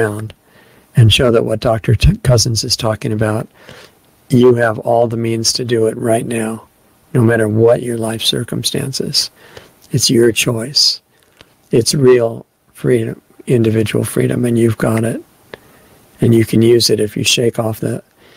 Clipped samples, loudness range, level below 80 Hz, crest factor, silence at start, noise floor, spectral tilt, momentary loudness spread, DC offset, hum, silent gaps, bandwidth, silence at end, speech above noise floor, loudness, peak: under 0.1%; 2 LU; -34 dBFS; 14 dB; 0 s; -48 dBFS; -5 dB/octave; 11 LU; under 0.1%; none; none; 16 kHz; 0.35 s; 35 dB; -14 LUFS; 0 dBFS